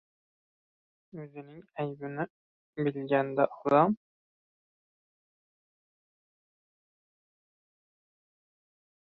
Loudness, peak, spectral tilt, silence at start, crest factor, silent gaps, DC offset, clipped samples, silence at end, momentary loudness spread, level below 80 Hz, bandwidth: -30 LUFS; -12 dBFS; -9.5 dB/octave; 1.15 s; 24 dB; 2.30-2.73 s; under 0.1%; under 0.1%; 5.1 s; 21 LU; -78 dBFS; 5.8 kHz